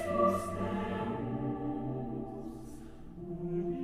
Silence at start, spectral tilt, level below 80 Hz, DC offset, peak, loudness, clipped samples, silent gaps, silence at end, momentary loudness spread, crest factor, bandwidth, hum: 0 s; -7.5 dB/octave; -54 dBFS; under 0.1%; -16 dBFS; -36 LUFS; under 0.1%; none; 0 s; 17 LU; 18 dB; 15.5 kHz; none